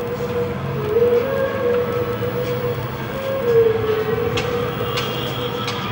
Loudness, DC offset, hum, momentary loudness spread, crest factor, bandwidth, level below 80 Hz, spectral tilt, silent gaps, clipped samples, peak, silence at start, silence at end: -21 LUFS; under 0.1%; none; 7 LU; 14 dB; 16.5 kHz; -44 dBFS; -6 dB/octave; none; under 0.1%; -6 dBFS; 0 s; 0 s